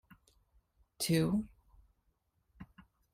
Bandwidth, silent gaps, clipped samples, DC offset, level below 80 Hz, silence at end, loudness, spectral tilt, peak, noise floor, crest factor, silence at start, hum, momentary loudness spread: 16 kHz; none; under 0.1%; under 0.1%; -62 dBFS; 0.35 s; -33 LUFS; -5.5 dB/octave; -20 dBFS; -78 dBFS; 20 dB; 1 s; none; 25 LU